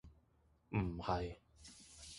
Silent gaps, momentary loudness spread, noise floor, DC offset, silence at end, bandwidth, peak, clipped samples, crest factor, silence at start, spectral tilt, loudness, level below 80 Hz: none; 18 LU; -74 dBFS; under 0.1%; 0 s; 11.5 kHz; -24 dBFS; under 0.1%; 20 dB; 0.05 s; -6 dB/octave; -42 LUFS; -56 dBFS